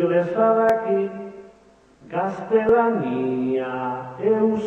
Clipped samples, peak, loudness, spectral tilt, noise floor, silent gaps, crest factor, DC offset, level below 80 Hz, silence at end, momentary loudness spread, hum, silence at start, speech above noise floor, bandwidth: under 0.1%; -6 dBFS; -21 LUFS; -8.5 dB/octave; -53 dBFS; none; 16 dB; under 0.1%; -58 dBFS; 0 s; 11 LU; none; 0 s; 33 dB; 7.6 kHz